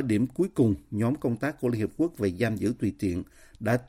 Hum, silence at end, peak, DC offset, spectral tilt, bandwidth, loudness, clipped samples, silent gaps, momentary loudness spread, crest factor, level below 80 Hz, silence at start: none; 0 s; -12 dBFS; under 0.1%; -7.5 dB/octave; 16 kHz; -28 LUFS; under 0.1%; none; 6 LU; 16 dB; -54 dBFS; 0 s